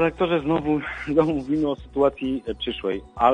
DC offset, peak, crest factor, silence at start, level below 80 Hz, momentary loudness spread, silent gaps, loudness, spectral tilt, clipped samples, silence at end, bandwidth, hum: under 0.1%; -4 dBFS; 18 dB; 0 s; -46 dBFS; 7 LU; none; -24 LUFS; -7.5 dB/octave; under 0.1%; 0 s; 9.2 kHz; none